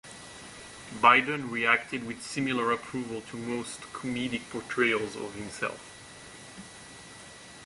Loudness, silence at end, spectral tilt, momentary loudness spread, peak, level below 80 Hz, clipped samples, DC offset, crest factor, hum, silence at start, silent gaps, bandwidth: -28 LUFS; 0 s; -4 dB/octave; 22 LU; -6 dBFS; -64 dBFS; under 0.1%; under 0.1%; 24 dB; none; 0.05 s; none; 11.5 kHz